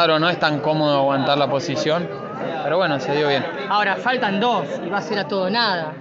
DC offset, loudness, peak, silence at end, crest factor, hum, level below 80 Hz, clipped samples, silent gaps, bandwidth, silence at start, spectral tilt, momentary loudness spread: under 0.1%; -20 LUFS; -4 dBFS; 0 s; 16 dB; none; -64 dBFS; under 0.1%; none; 7.6 kHz; 0 s; -3 dB/octave; 6 LU